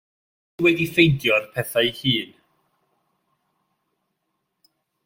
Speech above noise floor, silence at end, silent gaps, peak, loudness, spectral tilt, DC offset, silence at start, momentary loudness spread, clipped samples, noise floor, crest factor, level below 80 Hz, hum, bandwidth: 56 dB; 2.8 s; none; -2 dBFS; -20 LUFS; -5.5 dB/octave; under 0.1%; 0.6 s; 8 LU; under 0.1%; -76 dBFS; 22 dB; -56 dBFS; none; 16.5 kHz